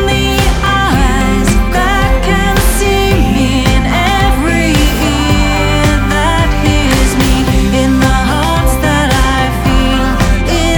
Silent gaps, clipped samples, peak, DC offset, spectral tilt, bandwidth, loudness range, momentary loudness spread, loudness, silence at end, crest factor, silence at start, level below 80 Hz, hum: none; under 0.1%; 0 dBFS; under 0.1%; -5 dB/octave; over 20 kHz; 0 LU; 1 LU; -11 LUFS; 0 s; 10 dB; 0 s; -14 dBFS; none